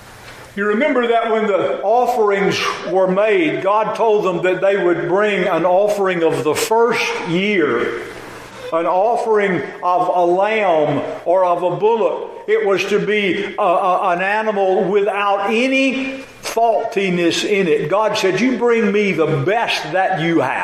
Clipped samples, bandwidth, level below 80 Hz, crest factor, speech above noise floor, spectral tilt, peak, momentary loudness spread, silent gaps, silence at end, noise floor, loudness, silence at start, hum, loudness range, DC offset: under 0.1%; 15.5 kHz; -58 dBFS; 12 dB; 21 dB; -5 dB/octave; -4 dBFS; 5 LU; none; 0 s; -37 dBFS; -16 LUFS; 0 s; none; 2 LU; under 0.1%